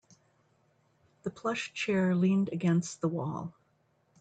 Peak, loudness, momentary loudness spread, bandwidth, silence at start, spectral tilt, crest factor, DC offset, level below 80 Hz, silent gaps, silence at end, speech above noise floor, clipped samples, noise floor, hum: -18 dBFS; -31 LUFS; 14 LU; 9 kHz; 1.25 s; -6.5 dB/octave; 14 dB; under 0.1%; -74 dBFS; none; 0.7 s; 42 dB; under 0.1%; -71 dBFS; none